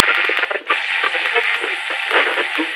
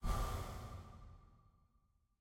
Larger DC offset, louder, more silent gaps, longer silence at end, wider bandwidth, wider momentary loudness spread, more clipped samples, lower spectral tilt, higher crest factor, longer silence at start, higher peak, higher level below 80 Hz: neither; first, -17 LUFS vs -46 LUFS; neither; second, 0 s vs 0.85 s; about the same, 16 kHz vs 16.5 kHz; second, 4 LU vs 20 LU; neither; second, 0 dB/octave vs -5.5 dB/octave; about the same, 18 dB vs 20 dB; about the same, 0 s vs 0 s; first, 0 dBFS vs -26 dBFS; second, -76 dBFS vs -48 dBFS